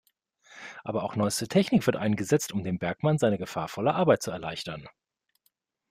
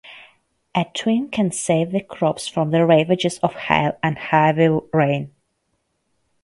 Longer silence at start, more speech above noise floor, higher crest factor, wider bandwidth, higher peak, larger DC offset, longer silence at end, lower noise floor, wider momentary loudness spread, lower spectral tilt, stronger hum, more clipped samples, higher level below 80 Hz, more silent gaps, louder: first, 0.5 s vs 0.05 s; second, 47 dB vs 52 dB; about the same, 20 dB vs 20 dB; first, 16 kHz vs 11.5 kHz; second, -8 dBFS vs 0 dBFS; neither; second, 1 s vs 1.15 s; about the same, -74 dBFS vs -71 dBFS; first, 13 LU vs 8 LU; about the same, -5.5 dB/octave vs -5.5 dB/octave; neither; neither; second, -62 dBFS vs -56 dBFS; neither; second, -27 LUFS vs -19 LUFS